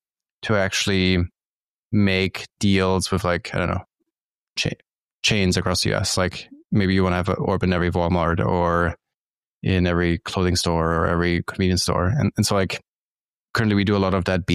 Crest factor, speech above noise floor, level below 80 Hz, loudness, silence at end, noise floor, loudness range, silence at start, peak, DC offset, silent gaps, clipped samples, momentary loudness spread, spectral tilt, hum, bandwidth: 16 dB; over 70 dB; -42 dBFS; -21 LUFS; 0 s; under -90 dBFS; 2 LU; 0.4 s; -6 dBFS; under 0.1%; 1.45-1.90 s, 4.21-4.56 s, 5.04-5.19 s, 6.65-6.69 s, 9.14-9.61 s, 12.88-13.15 s, 13.21-13.54 s; under 0.1%; 7 LU; -5 dB/octave; none; 14.5 kHz